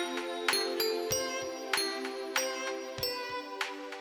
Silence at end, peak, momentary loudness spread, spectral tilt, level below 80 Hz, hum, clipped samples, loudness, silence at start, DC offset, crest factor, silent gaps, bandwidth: 0 s; -12 dBFS; 7 LU; -1.5 dB/octave; -66 dBFS; none; under 0.1%; -33 LUFS; 0 s; under 0.1%; 22 dB; none; over 20 kHz